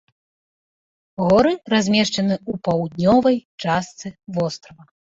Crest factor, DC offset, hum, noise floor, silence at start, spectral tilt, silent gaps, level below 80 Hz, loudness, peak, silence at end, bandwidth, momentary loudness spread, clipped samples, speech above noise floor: 16 dB; under 0.1%; none; under -90 dBFS; 1.2 s; -5.5 dB/octave; 3.45-3.58 s; -54 dBFS; -19 LUFS; -4 dBFS; 0.55 s; 7.8 kHz; 14 LU; under 0.1%; over 71 dB